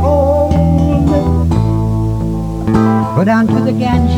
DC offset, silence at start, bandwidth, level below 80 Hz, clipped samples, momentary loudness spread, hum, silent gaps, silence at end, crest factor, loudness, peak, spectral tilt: under 0.1%; 0 s; 12 kHz; -22 dBFS; under 0.1%; 5 LU; none; none; 0 s; 12 dB; -13 LUFS; 0 dBFS; -8.5 dB/octave